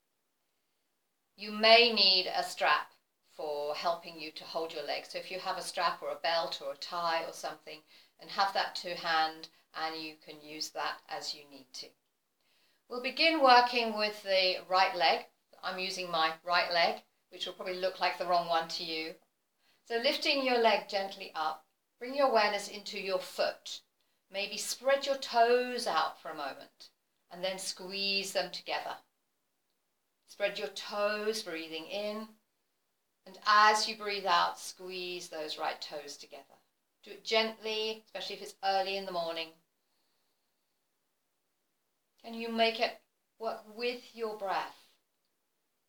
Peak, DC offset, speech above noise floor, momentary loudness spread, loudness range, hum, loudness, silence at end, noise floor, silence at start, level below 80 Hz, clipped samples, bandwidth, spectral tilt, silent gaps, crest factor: -8 dBFS; under 0.1%; 49 dB; 16 LU; 10 LU; none; -31 LUFS; 1.15 s; -82 dBFS; 1.4 s; under -90 dBFS; under 0.1%; over 20 kHz; -2 dB/octave; none; 26 dB